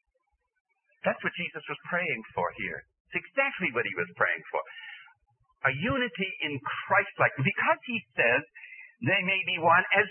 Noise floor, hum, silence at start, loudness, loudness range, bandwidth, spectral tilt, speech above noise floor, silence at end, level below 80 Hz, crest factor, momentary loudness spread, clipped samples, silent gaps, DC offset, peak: -77 dBFS; none; 1.05 s; -28 LUFS; 5 LU; 3.4 kHz; -9 dB/octave; 49 dB; 0 s; -64 dBFS; 22 dB; 12 LU; under 0.1%; 3.00-3.05 s; under 0.1%; -8 dBFS